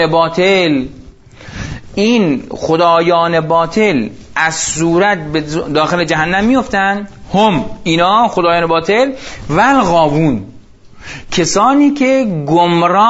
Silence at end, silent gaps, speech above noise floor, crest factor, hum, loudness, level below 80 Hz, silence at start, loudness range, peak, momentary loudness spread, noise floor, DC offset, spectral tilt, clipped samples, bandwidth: 0 s; none; 25 dB; 12 dB; none; -12 LUFS; -38 dBFS; 0 s; 1 LU; 0 dBFS; 9 LU; -36 dBFS; under 0.1%; -4.5 dB/octave; under 0.1%; 8 kHz